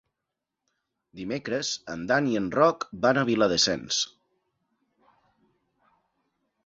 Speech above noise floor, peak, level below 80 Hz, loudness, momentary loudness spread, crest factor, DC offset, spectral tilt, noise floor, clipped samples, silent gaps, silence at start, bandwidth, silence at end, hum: 60 dB; -6 dBFS; -62 dBFS; -25 LUFS; 11 LU; 22 dB; under 0.1%; -3.5 dB/octave; -85 dBFS; under 0.1%; none; 1.15 s; 8 kHz; 2.6 s; none